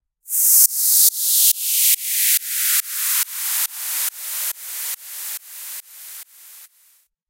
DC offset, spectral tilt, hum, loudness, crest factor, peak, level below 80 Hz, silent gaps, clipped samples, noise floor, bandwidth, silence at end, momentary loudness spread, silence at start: under 0.1%; 8.5 dB/octave; none; -16 LUFS; 20 dB; 0 dBFS; under -90 dBFS; none; under 0.1%; -58 dBFS; 17 kHz; 0.65 s; 19 LU; 0.25 s